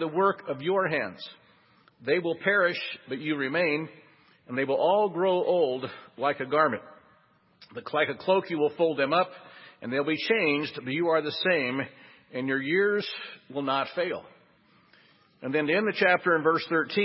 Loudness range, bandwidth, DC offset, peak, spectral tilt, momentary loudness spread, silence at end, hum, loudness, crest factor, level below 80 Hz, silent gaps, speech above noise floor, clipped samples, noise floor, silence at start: 3 LU; 5.8 kHz; under 0.1%; -8 dBFS; -9 dB/octave; 13 LU; 0 s; none; -27 LUFS; 20 dB; -76 dBFS; none; 36 dB; under 0.1%; -63 dBFS; 0 s